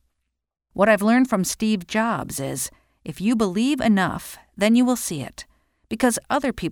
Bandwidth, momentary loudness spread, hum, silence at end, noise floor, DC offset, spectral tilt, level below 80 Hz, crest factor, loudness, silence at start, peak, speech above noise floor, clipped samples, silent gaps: 18.5 kHz; 17 LU; none; 0 s; -77 dBFS; under 0.1%; -4.5 dB/octave; -52 dBFS; 18 dB; -21 LUFS; 0.75 s; -4 dBFS; 56 dB; under 0.1%; none